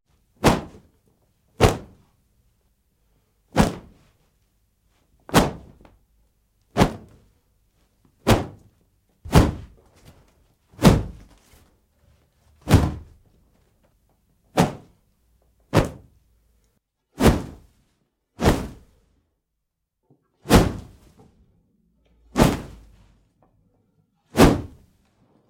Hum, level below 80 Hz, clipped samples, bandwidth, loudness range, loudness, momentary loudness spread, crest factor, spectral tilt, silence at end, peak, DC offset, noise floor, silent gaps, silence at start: none; -34 dBFS; under 0.1%; 16.5 kHz; 5 LU; -21 LUFS; 22 LU; 24 dB; -6 dB/octave; 0.8 s; -2 dBFS; under 0.1%; -79 dBFS; none; 0.4 s